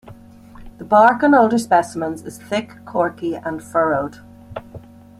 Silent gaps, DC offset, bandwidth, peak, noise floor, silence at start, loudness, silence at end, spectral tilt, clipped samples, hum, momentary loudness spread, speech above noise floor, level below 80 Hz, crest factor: none; under 0.1%; 14.5 kHz; -2 dBFS; -41 dBFS; 0.1 s; -18 LUFS; 0.4 s; -5.5 dB/octave; under 0.1%; none; 22 LU; 24 dB; -52 dBFS; 18 dB